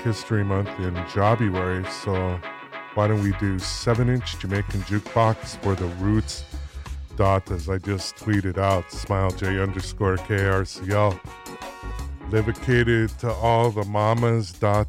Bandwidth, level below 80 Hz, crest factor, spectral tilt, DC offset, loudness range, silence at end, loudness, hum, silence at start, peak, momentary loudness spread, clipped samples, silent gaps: 13.5 kHz; -38 dBFS; 16 dB; -6.5 dB/octave; under 0.1%; 2 LU; 0 s; -24 LUFS; none; 0 s; -8 dBFS; 13 LU; under 0.1%; none